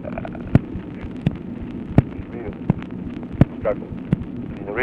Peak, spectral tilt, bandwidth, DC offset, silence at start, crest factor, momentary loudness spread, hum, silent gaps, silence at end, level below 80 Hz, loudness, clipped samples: 0 dBFS; -10 dB/octave; 5 kHz; under 0.1%; 0 s; 22 dB; 11 LU; none; none; 0 s; -36 dBFS; -24 LUFS; under 0.1%